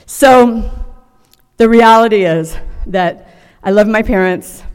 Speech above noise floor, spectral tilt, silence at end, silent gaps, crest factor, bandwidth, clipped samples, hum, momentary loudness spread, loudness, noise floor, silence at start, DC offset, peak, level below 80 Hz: 41 dB; -5 dB/octave; 0 s; none; 12 dB; 17 kHz; 0.8%; none; 17 LU; -10 LUFS; -50 dBFS; 0.1 s; under 0.1%; 0 dBFS; -28 dBFS